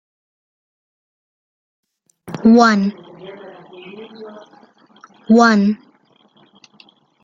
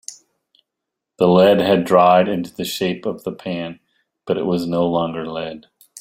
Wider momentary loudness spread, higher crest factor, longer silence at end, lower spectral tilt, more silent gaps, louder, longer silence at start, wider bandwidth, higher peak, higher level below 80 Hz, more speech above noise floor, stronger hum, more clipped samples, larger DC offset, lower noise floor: first, 27 LU vs 16 LU; about the same, 18 dB vs 18 dB; first, 1.5 s vs 0 s; about the same, -6 dB/octave vs -6 dB/octave; neither; first, -14 LUFS vs -18 LUFS; first, 2.25 s vs 0.1 s; second, 7.4 kHz vs 16 kHz; about the same, 0 dBFS vs -2 dBFS; about the same, -60 dBFS vs -58 dBFS; second, 43 dB vs 64 dB; neither; neither; neither; second, -55 dBFS vs -82 dBFS